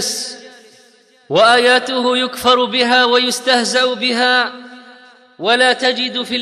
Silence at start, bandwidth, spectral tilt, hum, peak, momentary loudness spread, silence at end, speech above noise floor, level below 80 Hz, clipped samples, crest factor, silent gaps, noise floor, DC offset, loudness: 0 s; 14 kHz; -1.5 dB/octave; none; -2 dBFS; 11 LU; 0 s; 35 dB; -62 dBFS; under 0.1%; 14 dB; none; -50 dBFS; under 0.1%; -13 LUFS